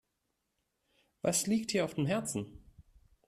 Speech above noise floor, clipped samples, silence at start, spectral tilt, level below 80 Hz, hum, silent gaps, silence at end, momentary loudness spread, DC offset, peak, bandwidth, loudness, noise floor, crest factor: 50 dB; under 0.1%; 1.25 s; -4 dB/octave; -64 dBFS; none; none; 0.45 s; 9 LU; under 0.1%; -18 dBFS; 14.5 kHz; -33 LUFS; -83 dBFS; 18 dB